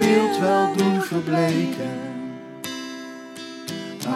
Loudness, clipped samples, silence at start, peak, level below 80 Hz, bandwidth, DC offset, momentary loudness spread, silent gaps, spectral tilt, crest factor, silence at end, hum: -23 LUFS; under 0.1%; 0 s; -6 dBFS; -68 dBFS; 16 kHz; under 0.1%; 16 LU; none; -5.5 dB/octave; 16 dB; 0 s; none